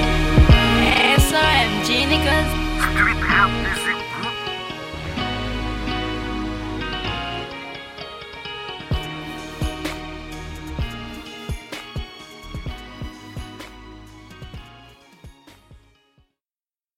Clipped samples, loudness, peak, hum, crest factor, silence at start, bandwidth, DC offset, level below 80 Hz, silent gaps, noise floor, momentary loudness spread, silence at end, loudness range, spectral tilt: under 0.1%; -20 LUFS; -2 dBFS; none; 20 dB; 0 s; 16 kHz; under 0.1%; -28 dBFS; none; under -90 dBFS; 21 LU; 1.25 s; 20 LU; -4.5 dB/octave